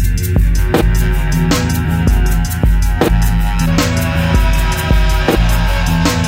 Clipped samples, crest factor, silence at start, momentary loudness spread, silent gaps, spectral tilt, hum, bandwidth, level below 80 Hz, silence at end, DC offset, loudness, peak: under 0.1%; 10 dB; 0 s; 2 LU; none; -5.5 dB/octave; none; 16.5 kHz; -14 dBFS; 0 s; under 0.1%; -14 LUFS; -2 dBFS